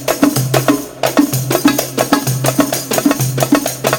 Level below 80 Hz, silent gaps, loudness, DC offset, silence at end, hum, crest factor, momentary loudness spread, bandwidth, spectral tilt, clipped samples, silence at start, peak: -46 dBFS; none; -14 LUFS; under 0.1%; 0 s; none; 14 dB; 2 LU; over 20 kHz; -4.5 dB/octave; under 0.1%; 0 s; 0 dBFS